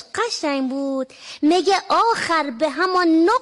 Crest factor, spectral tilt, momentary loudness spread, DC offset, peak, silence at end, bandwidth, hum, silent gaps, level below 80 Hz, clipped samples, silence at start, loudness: 10 dB; -2.5 dB/octave; 8 LU; under 0.1%; -8 dBFS; 0 s; 11.5 kHz; none; none; -62 dBFS; under 0.1%; 0.15 s; -19 LUFS